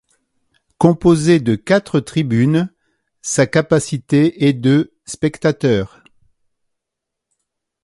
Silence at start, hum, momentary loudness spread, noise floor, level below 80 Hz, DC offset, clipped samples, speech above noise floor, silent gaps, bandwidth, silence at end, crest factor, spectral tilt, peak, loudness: 0.8 s; none; 8 LU; -81 dBFS; -48 dBFS; under 0.1%; under 0.1%; 66 dB; none; 11.5 kHz; 1.95 s; 16 dB; -6 dB/octave; 0 dBFS; -16 LUFS